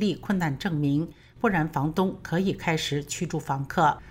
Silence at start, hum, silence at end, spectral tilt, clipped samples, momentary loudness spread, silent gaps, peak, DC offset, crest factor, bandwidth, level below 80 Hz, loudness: 0 s; none; 0 s; -5.5 dB/octave; under 0.1%; 6 LU; none; -10 dBFS; under 0.1%; 16 dB; 16 kHz; -52 dBFS; -27 LUFS